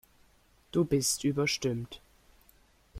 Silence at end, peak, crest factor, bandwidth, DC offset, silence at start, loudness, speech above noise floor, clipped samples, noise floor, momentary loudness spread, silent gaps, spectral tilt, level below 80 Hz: 0 s; -16 dBFS; 18 dB; 16.5 kHz; under 0.1%; 0.75 s; -30 LUFS; 35 dB; under 0.1%; -65 dBFS; 14 LU; none; -4 dB/octave; -58 dBFS